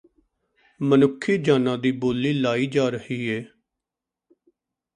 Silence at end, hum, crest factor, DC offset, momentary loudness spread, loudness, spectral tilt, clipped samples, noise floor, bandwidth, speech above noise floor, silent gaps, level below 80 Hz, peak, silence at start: 1.5 s; none; 20 dB; under 0.1%; 10 LU; -22 LUFS; -7 dB/octave; under 0.1%; -87 dBFS; 10 kHz; 66 dB; none; -62 dBFS; -4 dBFS; 0.8 s